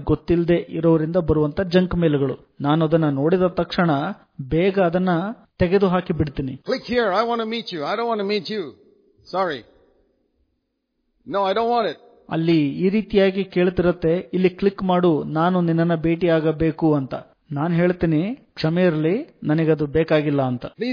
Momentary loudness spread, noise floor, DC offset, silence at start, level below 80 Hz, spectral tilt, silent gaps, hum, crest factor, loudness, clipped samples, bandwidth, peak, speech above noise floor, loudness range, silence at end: 8 LU; -74 dBFS; under 0.1%; 0 s; -44 dBFS; -9 dB/octave; none; none; 16 dB; -21 LUFS; under 0.1%; 5.2 kHz; -4 dBFS; 54 dB; 6 LU; 0 s